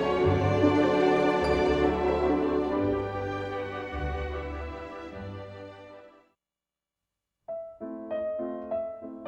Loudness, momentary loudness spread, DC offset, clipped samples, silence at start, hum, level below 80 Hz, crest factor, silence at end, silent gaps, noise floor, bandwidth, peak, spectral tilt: -28 LUFS; 17 LU; under 0.1%; under 0.1%; 0 s; none; -44 dBFS; 20 dB; 0 s; none; under -90 dBFS; 10 kHz; -10 dBFS; -7.5 dB/octave